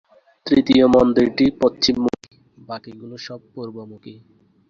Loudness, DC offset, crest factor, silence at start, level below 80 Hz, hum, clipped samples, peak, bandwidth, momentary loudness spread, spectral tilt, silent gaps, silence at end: -16 LUFS; under 0.1%; 18 dB; 0.45 s; -50 dBFS; none; under 0.1%; -2 dBFS; 7.4 kHz; 21 LU; -5.5 dB/octave; none; 0.6 s